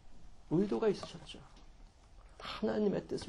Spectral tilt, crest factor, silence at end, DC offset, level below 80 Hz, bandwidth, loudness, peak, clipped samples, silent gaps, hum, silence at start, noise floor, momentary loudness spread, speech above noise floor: -6.5 dB/octave; 16 dB; 0 s; under 0.1%; -58 dBFS; 11.5 kHz; -35 LUFS; -20 dBFS; under 0.1%; none; none; 0.05 s; -58 dBFS; 17 LU; 23 dB